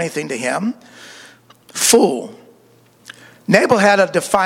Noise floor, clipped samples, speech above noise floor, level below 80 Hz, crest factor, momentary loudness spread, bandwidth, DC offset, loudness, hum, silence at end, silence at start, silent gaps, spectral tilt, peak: -51 dBFS; under 0.1%; 35 dB; -58 dBFS; 18 dB; 21 LU; 17 kHz; under 0.1%; -15 LUFS; none; 0 s; 0 s; none; -3.5 dB/octave; 0 dBFS